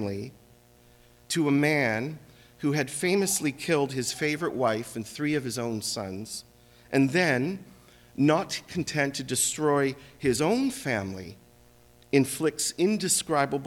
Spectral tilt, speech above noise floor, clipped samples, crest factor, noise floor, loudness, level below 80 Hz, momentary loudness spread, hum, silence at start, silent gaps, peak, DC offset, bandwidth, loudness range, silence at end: -4 dB/octave; 30 dB; under 0.1%; 18 dB; -57 dBFS; -27 LUFS; -62 dBFS; 13 LU; 60 Hz at -60 dBFS; 0 s; none; -10 dBFS; under 0.1%; 18.5 kHz; 2 LU; 0 s